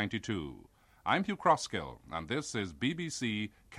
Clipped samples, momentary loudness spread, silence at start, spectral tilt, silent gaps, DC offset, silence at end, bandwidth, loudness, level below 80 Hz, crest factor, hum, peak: under 0.1%; 11 LU; 0 s; -4.5 dB/octave; none; under 0.1%; 0 s; 13.5 kHz; -34 LUFS; -60 dBFS; 22 dB; none; -14 dBFS